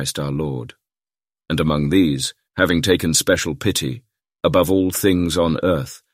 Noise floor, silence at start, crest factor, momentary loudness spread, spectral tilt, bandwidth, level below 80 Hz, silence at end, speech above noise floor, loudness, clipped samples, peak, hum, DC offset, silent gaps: under -90 dBFS; 0 s; 18 dB; 9 LU; -4.5 dB/octave; 16 kHz; -42 dBFS; 0.15 s; over 71 dB; -19 LUFS; under 0.1%; -2 dBFS; none; under 0.1%; none